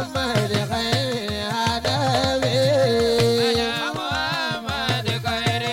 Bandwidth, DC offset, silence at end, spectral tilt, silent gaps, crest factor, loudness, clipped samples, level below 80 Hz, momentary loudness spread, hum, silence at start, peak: 17 kHz; under 0.1%; 0 s; -4.5 dB/octave; none; 14 dB; -21 LUFS; under 0.1%; -44 dBFS; 6 LU; none; 0 s; -6 dBFS